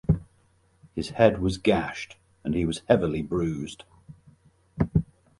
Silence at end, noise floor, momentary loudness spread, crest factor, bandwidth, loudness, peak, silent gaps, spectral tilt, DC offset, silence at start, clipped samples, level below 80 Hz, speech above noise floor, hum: 0.35 s; -63 dBFS; 16 LU; 24 dB; 11.5 kHz; -26 LUFS; -4 dBFS; none; -7 dB/octave; under 0.1%; 0.1 s; under 0.1%; -44 dBFS; 38 dB; none